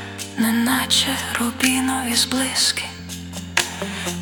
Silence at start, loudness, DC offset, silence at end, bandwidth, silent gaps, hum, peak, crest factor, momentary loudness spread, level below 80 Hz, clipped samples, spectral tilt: 0 s; -19 LUFS; under 0.1%; 0 s; 18 kHz; none; none; 0 dBFS; 22 dB; 13 LU; -56 dBFS; under 0.1%; -2 dB/octave